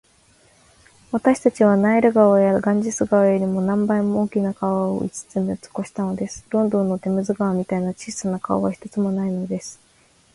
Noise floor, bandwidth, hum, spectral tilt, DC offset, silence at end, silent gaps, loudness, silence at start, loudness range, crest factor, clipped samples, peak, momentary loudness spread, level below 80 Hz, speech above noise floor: -57 dBFS; 11.5 kHz; none; -7 dB/octave; under 0.1%; 0.6 s; none; -21 LUFS; 1.1 s; 6 LU; 18 dB; under 0.1%; -4 dBFS; 11 LU; -56 dBFS; 37 dB